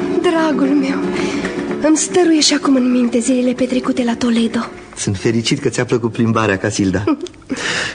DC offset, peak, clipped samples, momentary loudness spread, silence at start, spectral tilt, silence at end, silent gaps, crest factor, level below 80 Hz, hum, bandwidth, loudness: under 0.1%; 0 dBFS; under 0.1%; 8 LU; 0 s; -4.5 dB/octave; 0 s; none; 14 dB; -48 dBFS; none; 10 kHz; -16 LUFS